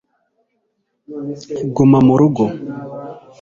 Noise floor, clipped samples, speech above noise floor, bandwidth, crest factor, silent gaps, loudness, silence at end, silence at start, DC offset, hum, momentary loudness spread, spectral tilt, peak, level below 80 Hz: -69 dBFS; under 0.1%; 55 dB; 7.4 kHz; 16 dB; none; -14 LUFS; 0.2 s; 1.1 s; under 0.1%; none; 21 LU; -9 dB/octave; -2 dBFS; -50 dBFS